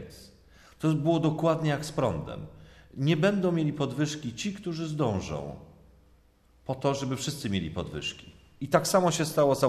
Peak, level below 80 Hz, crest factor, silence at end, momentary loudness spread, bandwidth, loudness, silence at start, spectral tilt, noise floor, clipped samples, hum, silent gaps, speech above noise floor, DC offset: -8 dBFS; -56 dBFS; 22 dB; 0 s; 17 LU; 14 kHz; -28 LUFS; 0 s; -5.5 dB/octave; -61 dBFS; under 0.1%; none; none; 34 dB; under 0.1%